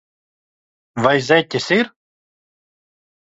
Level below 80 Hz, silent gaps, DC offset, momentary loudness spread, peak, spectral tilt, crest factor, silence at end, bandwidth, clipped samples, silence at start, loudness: -60 dBFS; none; under 0.1%; 10 LU; 0 dBFS; -5 dB/octave; 20 dB; 1.45 s; 8 kHz; under 0.1%; 0.95 s; -17 LUFS